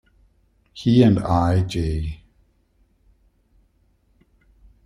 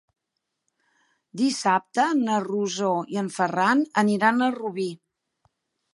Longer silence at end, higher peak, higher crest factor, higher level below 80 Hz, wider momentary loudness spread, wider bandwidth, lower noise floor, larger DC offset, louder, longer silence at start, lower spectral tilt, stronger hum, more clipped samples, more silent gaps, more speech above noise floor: first, 2.7 s vs 1 s; first, -2 dBFS vs -6 dBFS; about the same, 22 dB vs 20 dB; first, -40 dBFS vs -78 dBFS; first, 20 LU vs 9 LU; about the same, 11 kHz vs 11.5 kHz; second, -62 dBFS vs -81 dBFS; neither; first, -20 LUFS vs -24 LUFS; second, 0.75 s vs 1.35 s; first, -8 dB/octave vs -4.5 dB/octave; neither; neither; neither; second, 44 dB vs 58 dB